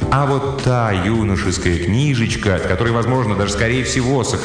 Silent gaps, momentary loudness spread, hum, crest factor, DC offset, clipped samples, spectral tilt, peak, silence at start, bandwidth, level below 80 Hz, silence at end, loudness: none; 2 LU; none; 12 dB; under 0.1%; under 0.1%; -5.5 dB/octave; -4 dBFS; 0 s; 10 kHz; -32 dBFS; 0 s; -17 LUFS